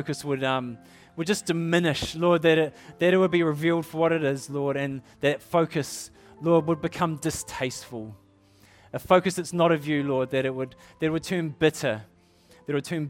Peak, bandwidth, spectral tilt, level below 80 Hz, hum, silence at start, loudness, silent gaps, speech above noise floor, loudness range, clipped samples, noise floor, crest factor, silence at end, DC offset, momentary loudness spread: -6 dBFS; 17 kHz; -5.5 dB/octave; -58 dBFS; none; 0 s; -25 LUFS; none; 32 dB; 4 LU; under 0.1%; -57 dBFS; 20 dB; 0 s; under 0.1%; 15 LU